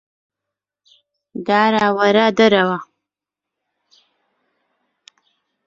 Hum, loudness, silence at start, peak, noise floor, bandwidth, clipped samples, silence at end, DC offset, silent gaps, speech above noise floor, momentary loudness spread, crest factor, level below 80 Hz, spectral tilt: none; -15 LUFS; 1.35 s; -2 dBFS; -85 dBFS; 7.6 kHz; under 0.1%; 2.8 s; under 0.1%; none; 71 dB; 15 LU; 18 dB; -64 dBFS; -5.5 dB/octave